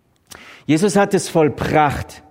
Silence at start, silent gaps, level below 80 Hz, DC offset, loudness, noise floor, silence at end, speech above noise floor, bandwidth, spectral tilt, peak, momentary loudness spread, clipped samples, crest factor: 0.45 s; none; -42 dBFS; under 0.1%; -17 LUFS; -43 dBFS; 0.1 s; 26 dB; 16 kHz; -5.5 dB/octave; -2 dBFS; 8 LU; under 0.1%; 16 dB